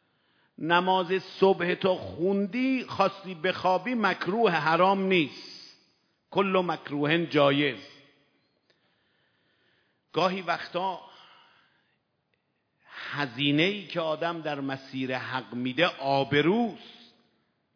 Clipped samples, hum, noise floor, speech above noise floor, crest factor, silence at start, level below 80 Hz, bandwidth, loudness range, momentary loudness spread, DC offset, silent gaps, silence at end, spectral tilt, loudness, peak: under 0.1%; none; -75 dBFS; 49 dB; 22 dB; 0.6 s; -76 dBFS; 5.4 kHz; 8 LU; 10 LU; under 0.1%; none; 0.85 s; -6.5 dB/octave; -27 LUFS; -6 dBFS